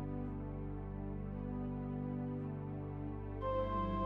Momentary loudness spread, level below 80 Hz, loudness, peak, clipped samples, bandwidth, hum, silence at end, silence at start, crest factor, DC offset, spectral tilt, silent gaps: 7 LU; -50 dBFS; -42 LUFS; -26 dBFS; under 0.1%; 5 kHz; 50 Hz at -60 dBFS; 0 s; 0 s; 14 dB; under 0.1%; -10.5 dB/octave; none